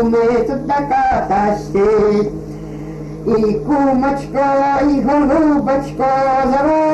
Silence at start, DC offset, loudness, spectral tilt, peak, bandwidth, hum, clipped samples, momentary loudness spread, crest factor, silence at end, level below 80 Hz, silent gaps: 0 s; under 0.1%; -15 LUFS; -7.5 dB/octave; -6 dBFS; 8.8 kHz; none; under 0.1%; 10 LU; 10 dB; 0 s; -36 dBFS; none